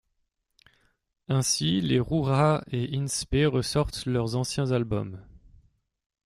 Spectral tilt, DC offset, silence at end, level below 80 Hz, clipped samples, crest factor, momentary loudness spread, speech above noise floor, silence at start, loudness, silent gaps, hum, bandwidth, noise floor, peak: -5 dB/octave; under 0.1%; 0.9 s; -46 dBFS; under 0.1%; 18 dB; 7 LU; 50 dB; 1.3 s; -26 LUFS; none; none; 15 kHz; -76 dBFS; -8 dBFS